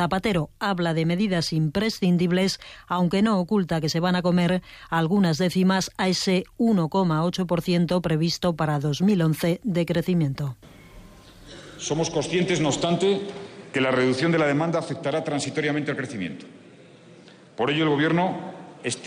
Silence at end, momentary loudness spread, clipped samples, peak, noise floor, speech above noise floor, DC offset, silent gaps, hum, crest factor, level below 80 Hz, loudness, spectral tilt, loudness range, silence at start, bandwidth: 0 s; 9 LU; under 0.1%; -12 dBFS; -49 dBFS; 26 dB; under 0.1%; none; none; 12 dB; -52 dBFS; -24 LUFS; -5.5 dB/octave; 4 LU; 0 s; 15 kHz